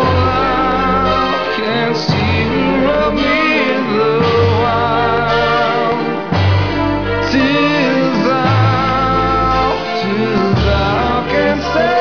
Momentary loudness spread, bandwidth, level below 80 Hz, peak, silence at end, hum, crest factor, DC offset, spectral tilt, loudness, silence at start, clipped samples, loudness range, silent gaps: 4 LU; 5.4 kHz; -30 dBFS; -4 dBFS; 0 s; none; 10 dB; 1%; -6.5 dB/octave; -14 LUFS; 0 s; under 0.1%; 1 LU; none